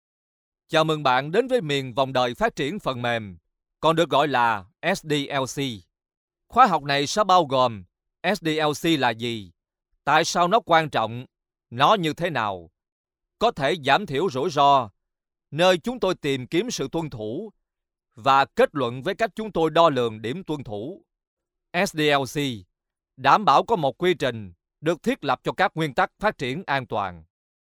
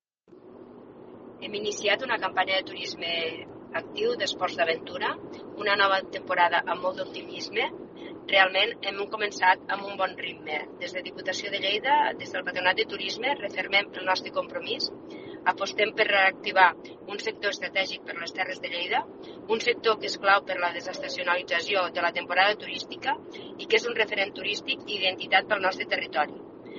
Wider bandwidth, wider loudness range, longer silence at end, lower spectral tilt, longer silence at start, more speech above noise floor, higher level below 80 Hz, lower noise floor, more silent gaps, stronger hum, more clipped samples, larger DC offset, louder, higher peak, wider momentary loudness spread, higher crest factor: first, 18.5 kHz vs 7.2 kHz; about the same, 3 LU vs 3 LU; first, 0.55 s vs 0 s; first, -4.5 dB/octave vs 1 dB/octave; first, 0.7 s vs 0.3 s; first, 62 dB vs 25 dB; first, -56 dBFS vs -72 dBFS; first, -84 dBFS vs -53 dBFS; first, 6.17-6.28 s, 12.92-13.04 s, 21.27-21.37 s vs none; neither; neither; neither; first, -23 LUFS vs -26 LUFS; about the same, -2 dBFS vs -4 dBFS; about the same, 12 LU vs 12 LU; about the same, 20 dB vs 24 dB